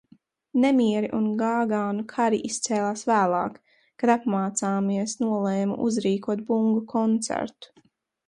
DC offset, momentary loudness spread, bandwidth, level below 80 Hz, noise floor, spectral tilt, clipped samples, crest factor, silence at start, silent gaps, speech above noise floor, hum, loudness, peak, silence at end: under 0.1%; 6 LU; 11.5 kHz; -68 dBFS; -62 dBFS; -5 dB/octave; under 0.1%; 16 dB; 0.55 s; none; 38 dB; none; -25 LUFS; -8 dBFS; 0.65 s